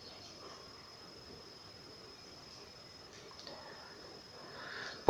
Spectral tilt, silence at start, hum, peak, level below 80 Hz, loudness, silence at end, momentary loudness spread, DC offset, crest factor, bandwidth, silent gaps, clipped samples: -2.5 dB/octave; 0 s; none; -10 dBFS; -72 dBFS; -50 LUFS; 0 s; 5 LU; under 0.1%; 36 dB; 18 kHz; none; under 0.1%